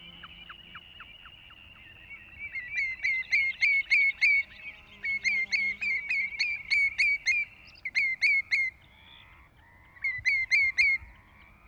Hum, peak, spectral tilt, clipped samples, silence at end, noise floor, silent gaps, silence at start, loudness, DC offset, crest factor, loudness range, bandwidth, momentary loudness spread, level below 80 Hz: none; -14 dBFS; 0 dB/octave; under 0.1%; 0.55 s; -57 dBFS; none; 0 s; -25 LUFS; under 0.1%; 16 dB; 4 LU; 10.5 kHz; 23 LU; -60 dBFS